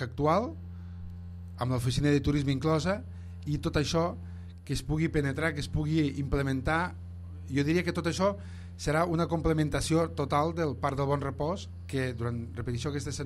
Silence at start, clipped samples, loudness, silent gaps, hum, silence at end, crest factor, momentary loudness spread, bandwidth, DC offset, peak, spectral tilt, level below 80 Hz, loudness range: 0 s; under 0.1%; -30 LUFS; none; none; 0 s; 16 dB; 16 LU; 14 kHz; under 0.1%; -12 dBFS; -6 dB/octave; -46 dBFS; 2 LU